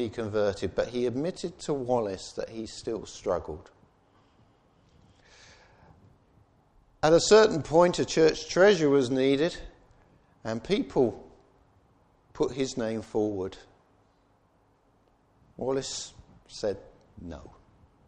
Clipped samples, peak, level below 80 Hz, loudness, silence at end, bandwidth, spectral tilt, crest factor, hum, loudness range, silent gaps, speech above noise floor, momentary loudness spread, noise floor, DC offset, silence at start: under 0.1%; -8 dBFS; -56 dBFS; -27 LUFS; 0.6 s; 9.8 kHz; -4.5 dB/octave; 22 dB; none; 15 LU; none; 39 dB; 21 LU; -66 dBFS; under 0.1%; 0 s